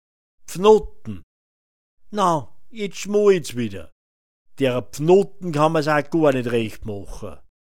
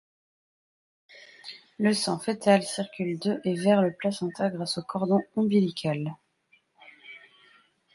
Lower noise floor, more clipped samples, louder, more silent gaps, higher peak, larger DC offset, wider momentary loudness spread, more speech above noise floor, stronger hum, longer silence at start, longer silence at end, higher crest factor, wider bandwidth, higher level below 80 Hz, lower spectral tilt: first, under -90 dBFS vs -66 dBFS; neither; first, -20 LUFS vs -27 LUFS; first, 1.23-1.97 s, 3.92-4.45 s vs none; first, -2 dBFS vs -6 dBFS; first, 2% vs under 0.1%; about the same, 20 LU vs 20 LU; first, over 70 dB vs 40 dB; neither; second, 0.4 s vs 1.45 s; second, 0.2 s vs 0.75 s; about the same, 20 dB vs 22 dB; first, 16.5 kHz vs 11.5 kHz; first, -48 dBFS vs -72 dBFS; about the same, -6 dB/octave vs -5.5 dB/octave